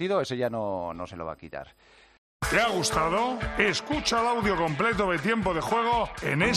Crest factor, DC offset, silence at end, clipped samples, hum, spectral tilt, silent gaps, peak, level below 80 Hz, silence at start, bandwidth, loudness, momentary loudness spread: 20 dB; under 0.1%; 0 s; under 0.1%; none; -4 dB/octave; 2.18-2.40 s; -8 dBFS; -46 dBFS; 0 s; 14 kHz; -26 LUFS; 12 LU